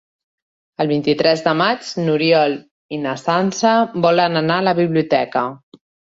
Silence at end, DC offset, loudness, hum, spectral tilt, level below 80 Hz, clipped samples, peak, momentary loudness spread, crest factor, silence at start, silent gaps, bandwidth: 0.45 s; under 0.1%; -17 LUFS; none; -5.5 dB/octave; -60 dBFS; under 0.1%; -2 dBFS; 9 LU; 16 dB; 0.8 s; 2.71-2.89 s; 8 kHz